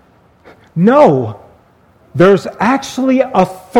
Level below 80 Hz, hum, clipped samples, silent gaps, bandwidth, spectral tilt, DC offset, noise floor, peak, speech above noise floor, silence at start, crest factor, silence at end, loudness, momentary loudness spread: -52 dBFS; none; 0.2%; none; 15.5 kHz; -7 dB/octave; under 0.1%; -48 dBFS; 0 dBFS; 38 dB; 0.75 s; 12 dB; 0 s; -12 LUFS; 13 LU